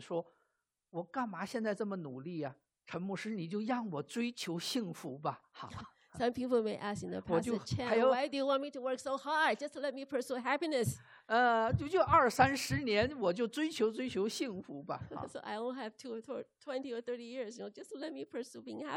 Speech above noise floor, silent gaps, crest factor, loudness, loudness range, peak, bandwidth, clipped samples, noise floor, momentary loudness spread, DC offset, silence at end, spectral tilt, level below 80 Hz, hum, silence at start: 47 dB; none; 22 dB; -36 LUFS; 11 LU; -14 dBFS; 15.5 kHz; under 0.1%; -83 dBFS; 15 LU; under 0.1%; 0 s; -5 dB/octave; -64 dBFS; none; 0 s